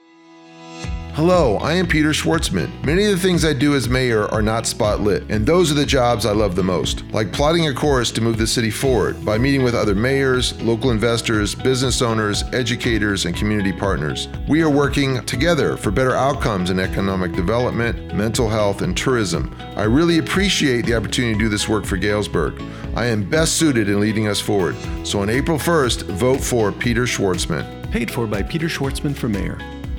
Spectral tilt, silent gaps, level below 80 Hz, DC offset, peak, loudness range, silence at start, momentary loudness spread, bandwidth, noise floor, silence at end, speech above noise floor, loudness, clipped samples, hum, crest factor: -5 dB/octave; none; -32 dBFS; under 0.1%; -2 dBFS; 2 LU; 0.45 s; 6 LU; 18.5 kHz; -45 dBFS; 0 s; 27 dB; -19 LUFS; under 0.1%; none; 16 dB